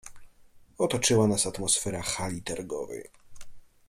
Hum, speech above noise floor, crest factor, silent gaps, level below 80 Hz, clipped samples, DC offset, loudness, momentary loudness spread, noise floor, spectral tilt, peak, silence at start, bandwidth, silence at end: none; 27 dB; 20 dB; none; -54 dBFS; under 0.1%; under 0.1%; -27 LUFS; 13 LU; -55 dBFS; -3.5 dB/octave; -10 dBFS; 0.05 s; 16 kHz; 0.25 s